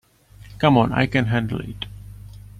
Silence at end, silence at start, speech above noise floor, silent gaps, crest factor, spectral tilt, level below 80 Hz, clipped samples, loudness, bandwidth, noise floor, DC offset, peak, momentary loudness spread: 0.2 s; 0.4 s; 27 dB; none; 20 dB; -7.5 dB/octave; -44 dBFS; under 0.1%; -20 LUFS; 13.5 kHz; -46 dBFS; under 0.1%; -4 dBFS; 23 LU